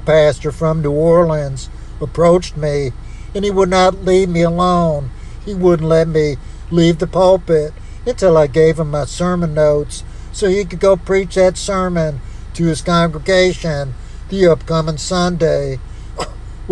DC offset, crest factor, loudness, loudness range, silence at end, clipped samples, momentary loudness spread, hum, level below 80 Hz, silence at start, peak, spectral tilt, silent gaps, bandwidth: under 0.1%; 14 dB; -15 LUFS; 2 LU; 0 s; under 0.1%; 15 LU; none; -30 dBFS; 0 s; 0 dBFS; -6 dB/octave; none; 11 kHz